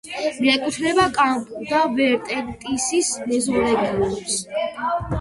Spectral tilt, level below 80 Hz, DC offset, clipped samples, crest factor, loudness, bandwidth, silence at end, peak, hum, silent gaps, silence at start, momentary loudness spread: -3.5 dB/octave; -46 dBFS; under 0.1%; under 0.1%; 16 dB; -21 LUFS; 11.5 kHz; 0 s; -4 dBFS; none; none; 0.05 s; 8 LU